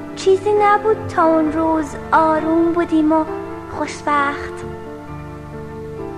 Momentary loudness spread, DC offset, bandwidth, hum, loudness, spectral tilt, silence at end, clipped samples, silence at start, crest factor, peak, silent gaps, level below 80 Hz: 17 LU; under 0.1%; 10.5 kHz; 50 Hz at -40 dBFS; -17 LUFS; -6 dB/octave; 0 s; under 0.1%; 0 s; 16 dB; -2 dBFS; none; -42 dBFS